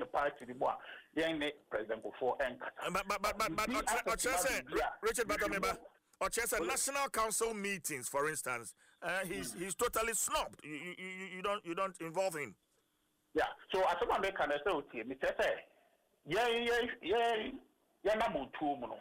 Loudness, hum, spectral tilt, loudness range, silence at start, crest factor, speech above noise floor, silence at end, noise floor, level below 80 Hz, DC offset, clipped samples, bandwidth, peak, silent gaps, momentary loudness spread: -36 LUFS; none; -2.5 dB/octave; 3 LU; 0 s; 14 dB; 42 dB; 0 s; -78 dBFS; -60 dBFS; under 0.1%; under 0.1%; 16 kHz; -24 dBFS; none; 10 LU